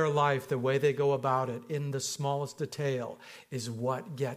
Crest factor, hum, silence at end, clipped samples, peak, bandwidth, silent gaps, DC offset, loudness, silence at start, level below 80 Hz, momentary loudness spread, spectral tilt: 18 dB; none; 0 s; under 0.1%; -14 dBFS; 15.5 kHz; none; under 0.1%; -31 LUFS; 0 s; -74 dBFS; 10 LU; -5.5 dB/octave